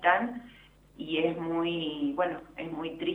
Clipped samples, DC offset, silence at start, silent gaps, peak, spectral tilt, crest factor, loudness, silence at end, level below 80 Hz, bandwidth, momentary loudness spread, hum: under 0.1%; under 0.1%; 0 s; none; -8 dBFS; -7 dB/octave; 22 dB; -31 LUFS; 0 s; -62 dBFS; 4 kHz; 10 LU; none